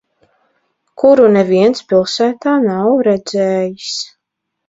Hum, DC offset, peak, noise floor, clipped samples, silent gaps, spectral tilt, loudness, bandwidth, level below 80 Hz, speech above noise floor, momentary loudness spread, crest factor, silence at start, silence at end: none; under 0.1%; 0 dBFS; -76 dBFS; under 0.1%; none; -5.5 dB/octave; -13 LUFS; 8 kHz; -58 dBFS; 64 dB; 12 LU; 14 dB; 1 s; 0.6 s